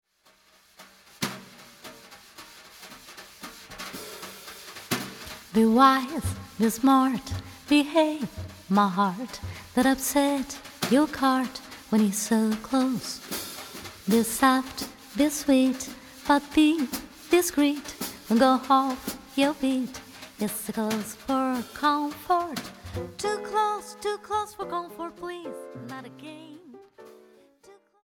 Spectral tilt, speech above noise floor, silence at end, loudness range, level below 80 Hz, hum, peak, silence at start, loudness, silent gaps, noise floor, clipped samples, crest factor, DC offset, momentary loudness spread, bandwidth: -4 dB/octave; 37 dB; 0.9 s; 15 LU; -56 dBFS; none; -6 dBFS; 0.8 s; -26 LUFS; none; -62 dBFS; under 0.1%; 22 dB; under 0.1%; 20 LU; 19 kHz